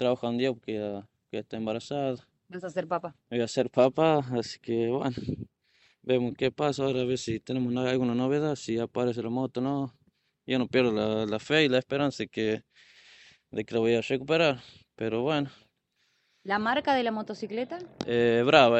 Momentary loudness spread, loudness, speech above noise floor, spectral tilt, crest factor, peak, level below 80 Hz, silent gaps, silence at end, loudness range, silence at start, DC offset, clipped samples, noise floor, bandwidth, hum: 13 LU; -28 LUFS; 46 dB; -6 dB/octave; 24 dB; -4 dBFS; -64 dBFS; none; 0 s; 3 LU; 0 s; under 0.1%; under 0.1%; -73 dBFS; 8.4 kHz; none